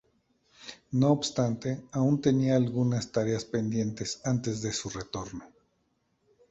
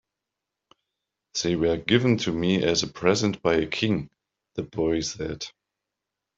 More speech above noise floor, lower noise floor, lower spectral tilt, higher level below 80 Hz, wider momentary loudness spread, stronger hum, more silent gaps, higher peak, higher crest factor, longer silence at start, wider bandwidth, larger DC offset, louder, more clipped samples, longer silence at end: second, 46 dB vs 61 dB; second, -74 dBFS vs -86 dBFS; about the same, -6 dB/octave vs -5 dB/octave; second, -60 dBFS vs -52 dBFS; about the same, 13 LU vs 13 LU; neither; neither; second, -10 dBFS vs -4 dBFS; about the same, 20 dB vs 22 dB; second, 0.6 s vs 1.35 s; about the same, 8.2 kHz vs 7.8 kHz; neither; second, -29 LUFS vs -25 LUFS; neither; first, 1.05 s vs 0.9 s